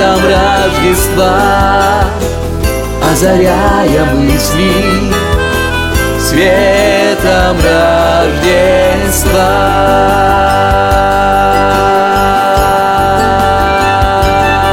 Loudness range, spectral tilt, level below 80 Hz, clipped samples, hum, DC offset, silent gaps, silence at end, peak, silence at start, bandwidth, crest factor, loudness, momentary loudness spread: 1 LU; -4.5 dB/octave; -20 dBFS; under 0.1%; none; 0.3%; none; 0 s; 0 dBFS; 0 s; 17 kHz; 8 dB; -9 LUFS; 4 LU